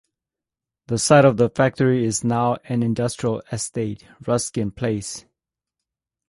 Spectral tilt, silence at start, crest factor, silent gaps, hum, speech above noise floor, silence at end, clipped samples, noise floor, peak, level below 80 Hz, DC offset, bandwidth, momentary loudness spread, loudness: -5.5 dB/octave; 0.9 s; 20 dB; none; none; 68 dB; 1.1 s; under 0.1%; -88 dBFS; -2 dBFS; -52 dBFS; under 0.1%; 11.5 kHz; 13 LU; -21 LUFS